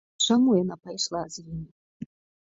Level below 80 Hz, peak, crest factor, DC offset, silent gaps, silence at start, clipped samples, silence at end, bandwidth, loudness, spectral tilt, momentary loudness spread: -58 dBFS; -10 dBFS; 18 dB; under 0.1%; 1.71-2.00 s; 0.2 s; under 0.1%; 0.45 s; 8 kHz; -25 LUFS; -4.5 dB/octave; 23 LU